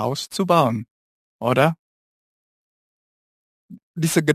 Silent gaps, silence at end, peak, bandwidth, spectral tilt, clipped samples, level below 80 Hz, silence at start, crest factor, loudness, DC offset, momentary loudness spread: 0.91-1.39 s, 1.79-3.69 s, 3.83-3.94 s; 0 s; 0 dBFS; 15 kHz; -5.5 dB/octave; under 0.1%; -64 dBFS; 0 s; 22 dB; -21 LUFS; under 0.1%; 14 LU